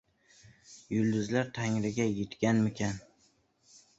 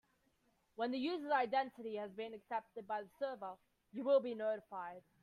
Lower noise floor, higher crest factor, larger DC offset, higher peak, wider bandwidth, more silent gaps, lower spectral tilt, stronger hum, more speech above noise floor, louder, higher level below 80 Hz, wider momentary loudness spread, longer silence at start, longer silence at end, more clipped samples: second, -69 dBFS vs -78 dBFS; about the same, 18 dB vs 18 dB; neither; first, -14 dBFS vs -22 dBFS; first, 8 kHz vs 5.2 kHz; neither; about the same, -6 dB/octave vs -6 dB/octave; neither; about the same, 39 dB vs 38 dB; first, -31 LUFS vs -40 LUFS; first, -62 dBFS vs -86 dBFS; second, 12 LU vs 15 LU; about the same, 0.7 s vs 0.8 s; first, 1 s vs 0.25 s; neither